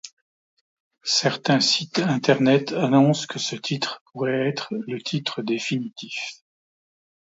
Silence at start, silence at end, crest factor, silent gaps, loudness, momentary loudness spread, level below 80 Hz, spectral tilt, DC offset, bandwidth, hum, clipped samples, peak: 0.05 s; 0.9 s; 20 dB; 0.13-0.91 s, 4.01-4.06 s; -23 LUFS; 12 LU; -70 dBFS; -4.5 dB/octave; under 0.1%; 8 kHz; none; under 0.1%; -4 dBFS